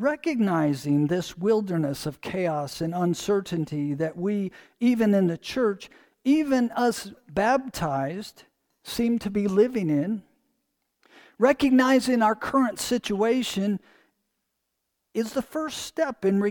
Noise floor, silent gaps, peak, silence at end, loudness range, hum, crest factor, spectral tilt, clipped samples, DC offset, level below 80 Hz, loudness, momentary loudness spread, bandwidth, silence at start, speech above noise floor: -79 dBFS; none; -8 dBFS; 0 s; 4 LU; none; 18 dB; -6 dB/octave; under 0.1%; under 0.1%; -58 dBFS; -25 LUFS; 10 LU; 19 kHz; 0 s; 55 dB